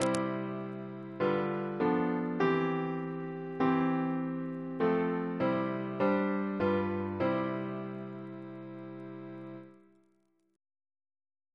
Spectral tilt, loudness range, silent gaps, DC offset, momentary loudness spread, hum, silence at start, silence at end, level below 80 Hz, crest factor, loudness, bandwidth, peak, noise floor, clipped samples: -7 dB/octave; 13 LU; none; under 0.1%; 15 LU; none; 0 s; 1.8 s; -70 dBFS; 24 dB; -33 LUFS; 11 kHz; -10 dBFS; -73 dBFS; under 0.1%